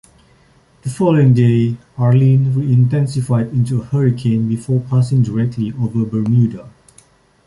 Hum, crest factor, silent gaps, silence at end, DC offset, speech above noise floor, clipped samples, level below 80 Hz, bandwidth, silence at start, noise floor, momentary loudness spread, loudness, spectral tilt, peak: none; 14 dB; none; 0.8 s; under 0.1%; 37 dB; under 0.1%; -48 dBFS; 11.5 kHz; 0.85 s; -51 dBFS; 8 LU; -15 LUFS; -9 dB/octave; -2 dBFS